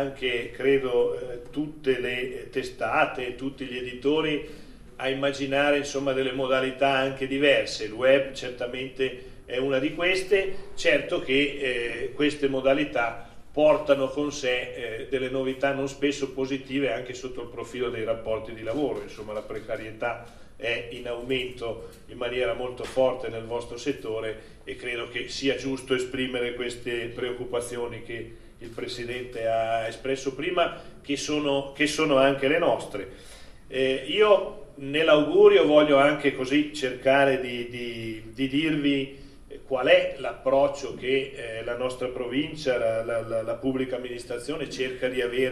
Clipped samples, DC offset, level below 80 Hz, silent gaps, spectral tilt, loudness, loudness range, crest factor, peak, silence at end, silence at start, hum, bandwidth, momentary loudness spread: under 0.1%; under 0.1%; -50 dBFS; none; -4.5 dB/octave; -26 LUFS; 10 LU; 22 dB; -4 dBFS; 0 s; 0 s; none; 12.5 kHz; 13 LU